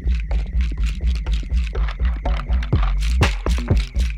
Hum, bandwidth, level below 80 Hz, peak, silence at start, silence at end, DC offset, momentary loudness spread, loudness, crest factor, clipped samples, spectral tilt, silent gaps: none; 10 kHz; -20 dBFS; -2 dBFS; 0 s; 0 s; under 0.1%; 5 LU; -22 LUFS; 16 dB; under 0.1%; -6 dB/octave; none